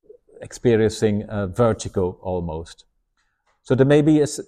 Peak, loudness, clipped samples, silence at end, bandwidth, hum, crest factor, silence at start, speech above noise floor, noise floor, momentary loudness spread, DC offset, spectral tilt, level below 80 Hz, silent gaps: -4 dBFS; -20 LUFS; under 0.1%; 0.05 s; 13.5 kHz; none; 18 dB; 0.4 s; 50 dB; -69 dBFS; 15 LU; under 0.1%; -6.5 dB/octave; -46 dBFS; none